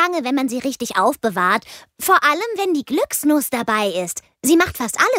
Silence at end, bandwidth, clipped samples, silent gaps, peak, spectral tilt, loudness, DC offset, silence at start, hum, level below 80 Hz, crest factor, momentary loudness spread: 0 s; 16.5 kHz; under 0.1%; none; -2 dBFS; -3 dB/octave; -18 LUFS; under 0.1%; 0 s; none; -54 dBFS; 16 dB; 7 LU